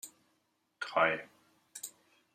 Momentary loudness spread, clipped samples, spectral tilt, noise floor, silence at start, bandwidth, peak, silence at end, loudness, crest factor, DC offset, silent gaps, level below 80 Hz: 20 LU; under 0.1%; -2.5 dB/octave; -78 dBFS; 0.05 s; 15.5 kHz; -14 dBFS; 0.45 s; -32 LUFS; 24 dB; under 0.1%; none; -86 dBFS